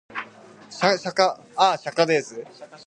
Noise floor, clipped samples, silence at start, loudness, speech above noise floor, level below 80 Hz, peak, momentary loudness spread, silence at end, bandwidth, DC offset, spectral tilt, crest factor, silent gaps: -46 dBFS; under 0.1%; 0.1 s; -22 LUFS; 24 dB; -74 dBFS; -2 dBFS; 19 LU; 0.1 s; 11 kHz; under 0.1%; -3.5 dB/octave; 22 dB; none